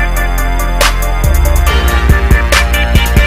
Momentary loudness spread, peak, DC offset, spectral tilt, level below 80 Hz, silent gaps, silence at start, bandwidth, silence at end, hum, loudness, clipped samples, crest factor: 5 LU; 0 dBFS; under 0.1%; -4.5 dB/octave; -10 dBFS; none; 0 s; 16.5 kHz; 0 s; none; -11 LUFS; 0.3%; 8 dB